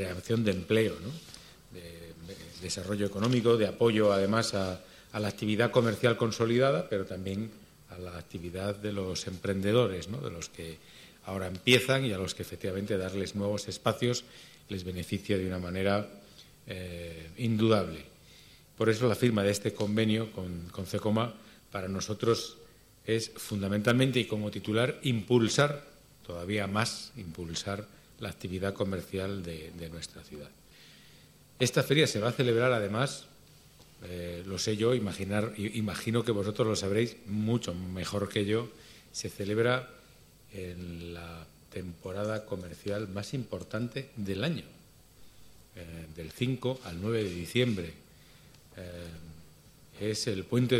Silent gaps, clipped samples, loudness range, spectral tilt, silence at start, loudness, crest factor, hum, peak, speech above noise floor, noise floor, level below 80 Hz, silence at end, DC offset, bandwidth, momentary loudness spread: none; under 0.1%; 8 LU; -5.5 dB/octave; 0 s; -31 LUFS; 26 dB; none; -6 dBFS; 26 dB; -57 dBFS; -60 dBFS; 0 s; under 0.1%; 16 kHz; 19 LU